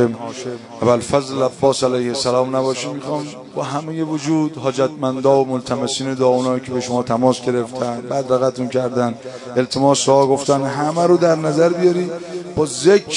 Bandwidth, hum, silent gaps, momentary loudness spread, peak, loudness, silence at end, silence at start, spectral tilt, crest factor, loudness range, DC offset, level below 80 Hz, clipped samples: 11 kHz; none; none; 10 LU; 0 dBFS; -18 LUFS; 0 s; 0 s; -5 dB/octave; 18 dB; 4 LU; under 0.1%; -56 dBFS; under 0.1%